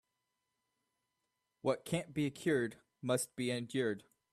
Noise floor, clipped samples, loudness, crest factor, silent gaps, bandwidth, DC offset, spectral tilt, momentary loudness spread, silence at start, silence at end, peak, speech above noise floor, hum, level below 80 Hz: -86 dBFS; under 0.1%; -37 LUFS; 20 dB; none; 14 kHz; under 0.1%; -5 dB/octave; 6 LU; 1.65 s; 0.3 s; -18 dBFS; 50 dB; none; -76 dBFS